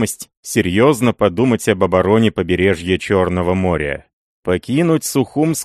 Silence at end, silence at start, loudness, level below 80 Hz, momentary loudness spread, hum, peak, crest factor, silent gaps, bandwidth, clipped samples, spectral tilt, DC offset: 0 s; 0 s; -16 LUFS; -42 dBFS; 8 LU; none; 0 dBFS; 16 dB; 0.37-0.43 s, 4.13-4.43 s; 13 kHz; under 0.1%; -5.5 dB/octave; under 0.1%